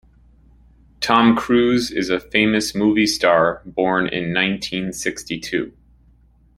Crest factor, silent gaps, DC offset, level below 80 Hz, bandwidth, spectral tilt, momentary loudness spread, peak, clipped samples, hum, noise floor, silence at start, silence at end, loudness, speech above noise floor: 20 dB; none; under 0.1%; -48 dBFS; 16 kHz; -4.5 dB/octave; 10 LU; 0 dBFS; under 0.1%; none; -53 dBFS; 1 s; 0.85 s; -18 LUFS; 35 dB